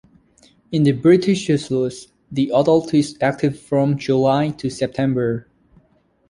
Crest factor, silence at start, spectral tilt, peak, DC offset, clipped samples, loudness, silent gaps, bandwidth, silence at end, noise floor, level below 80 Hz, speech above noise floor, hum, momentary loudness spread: 16 dB; 0.7 s; -7 dB/octave; -2 dBFS; under 0.1%; under 0.1%; -19 LUFS; none; 11 kHz; 0.9 s; -60 dBFS; -54 dBFS; 42 dB; none; 9 LU